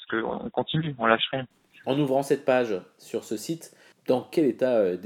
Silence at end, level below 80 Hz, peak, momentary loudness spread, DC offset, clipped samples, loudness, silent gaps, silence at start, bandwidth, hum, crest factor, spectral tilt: 0 s; -66 dBFS; -4 dBFS; 12 LU; under 0.1%; under 0.1%; -26 LUFS; none; 0 s; 17 kHz; none; 22 dB; -5.5 dB/octave